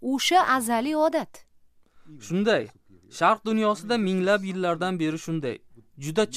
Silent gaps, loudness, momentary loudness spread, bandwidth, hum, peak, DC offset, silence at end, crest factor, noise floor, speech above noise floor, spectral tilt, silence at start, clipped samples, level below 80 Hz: none; -24 LUFS; 16 LU; 15.5 kHz; none; -8 dBFS; under 0.1%; 0 s; 18 dB; -57 dBFS; 33 dB; -4.5 dB/octave; 0 s; under 0.1%; -66 dBFS